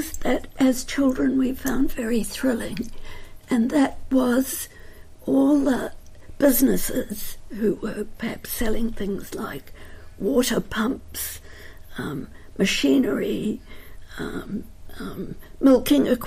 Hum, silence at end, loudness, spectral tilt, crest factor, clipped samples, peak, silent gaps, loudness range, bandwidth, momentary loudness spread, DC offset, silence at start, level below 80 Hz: none; 0 s; -23 LUFS; -4.5 dB/octave; 16 dB; under 0.1%; -6 dBFS; none; 5 LU; 15.5 kHz; 17 LU; under 0.1%; 0 s; -38 dBFS